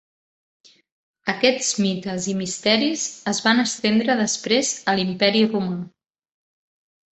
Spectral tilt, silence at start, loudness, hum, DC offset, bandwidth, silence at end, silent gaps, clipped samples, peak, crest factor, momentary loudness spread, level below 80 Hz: -3 dB/octave; 1.25 s; -21 LUFS; none; under 0.1%; 8.4 kHz; 1.25 s; none; under 0.1%; -2 dBFS; 20 dB; 8 LU; -64 dBFS